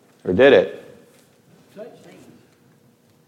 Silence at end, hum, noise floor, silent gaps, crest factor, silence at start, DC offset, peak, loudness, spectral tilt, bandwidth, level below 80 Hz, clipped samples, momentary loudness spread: 1.45 s; none; -56 dBFS; none; 20 dB; 0.25 s; under 0.1%; -2 dBFS; -16 LUFS; -6.5 dB/octave; 10 kHz; -60 dBFS; under 0.1%; 28 LU